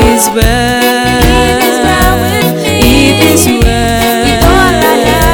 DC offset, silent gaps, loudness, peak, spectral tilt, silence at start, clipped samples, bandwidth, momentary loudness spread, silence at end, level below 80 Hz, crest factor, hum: 0.3%; none; -7 LUFS; 0 dBFS; -4 dB/octave; 0 s; 0.5%; 19.5 kHz; 3 LU; 0 s; -16 dBFS; 8 dB; none